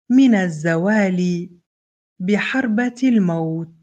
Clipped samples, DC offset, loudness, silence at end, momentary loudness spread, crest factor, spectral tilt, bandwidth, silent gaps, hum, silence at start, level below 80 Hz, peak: under 0.1%; under 0.1%; -18 LUFS; 0.15 s; 11 LU; 14 dB; -7 dB/octave; 8.8 kHz; 1.66-2.16 s; none; 0.1 s; -66 dBFS; -4 dBFS